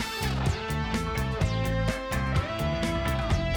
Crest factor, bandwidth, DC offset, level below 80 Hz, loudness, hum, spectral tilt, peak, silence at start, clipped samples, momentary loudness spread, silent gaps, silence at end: 12 dB; over 20 kHz; under 0.1%; -34 dBFS; -28 LUFS; none; -5.5 dB/octave; -14 dBFS; 0 s; under 0.1%; 2 LU; none; 0 s